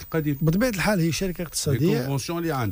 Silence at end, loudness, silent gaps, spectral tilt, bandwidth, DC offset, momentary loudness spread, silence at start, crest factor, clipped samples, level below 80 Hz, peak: 0 s; -24 LUFS; none; -5.5 dB/octave; 15.5 kHz; under 0.1%; 5 LU; 0 s; 12 dB; under 0.1%; -44 dBFS; -12 dBFS